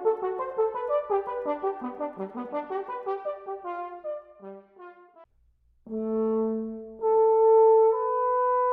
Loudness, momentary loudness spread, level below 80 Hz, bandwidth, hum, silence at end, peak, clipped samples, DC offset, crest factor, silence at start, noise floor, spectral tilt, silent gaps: -26 LUFS; 18 LU; -66 dBFS; 3.6 kHz; none; 0 s; -12 dBFS; under 0.1%; under 0.1%; 14 dB; 0 s; -64 dBFS; -9.5 dB/octave; none